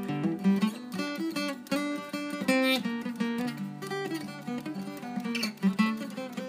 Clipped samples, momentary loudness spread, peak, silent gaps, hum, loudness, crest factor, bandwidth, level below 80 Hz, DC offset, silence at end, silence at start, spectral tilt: under 0.1%; 10 LU; -12 dBFS; none; none; -31 LUFS; 18 dB; 15.5 kHz; -78 dBFS; under 0.1%; 0 s; 0 s; -5.5 dB/octave